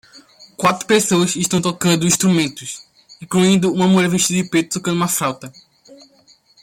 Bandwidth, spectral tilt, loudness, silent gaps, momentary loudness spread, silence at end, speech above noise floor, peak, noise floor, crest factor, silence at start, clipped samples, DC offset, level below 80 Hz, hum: 16.5 kHz; -4 dB/octave; -16 LUFS; none; 9 LU; 0.7 s; 36 dB; -2 dBFS; -53 dBFS; 16 dB; 0.15 s; under 0.1%; under 0.1%; -56 dBFS; none